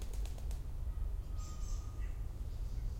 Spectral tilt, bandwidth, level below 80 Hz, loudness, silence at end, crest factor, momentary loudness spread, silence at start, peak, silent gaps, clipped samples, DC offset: -5.5 dB/octave; 16 kHz; -40 dBFS; -45 LUFS; 0 s; 10 dB; 2 LU; 0 s; -28 dBFS; none; under 0.1%; under 0.1%